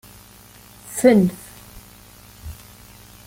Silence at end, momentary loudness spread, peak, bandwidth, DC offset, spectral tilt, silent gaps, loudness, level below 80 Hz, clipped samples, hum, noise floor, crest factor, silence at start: 0.75 s; 28 LU; -2 dBFS; 17 kHz; under 0.1%; -6 dB/octave; none; -17 LUFS; -48 dBFS; under 0.1%; none; -46 dBFS; 22 dB; 0.9 s